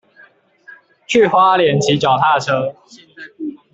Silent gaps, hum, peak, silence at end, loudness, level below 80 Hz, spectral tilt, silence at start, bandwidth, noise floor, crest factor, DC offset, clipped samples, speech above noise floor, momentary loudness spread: none; none; -2 dBFS; 0.2 s; -14 LUFS; -56 dBFS; -5 dB/octave; 0.7 s; 8.2 kHz; -49 dBFS; 14 dB; under 0.1%; under 0.1%; 34 dB; 17 LU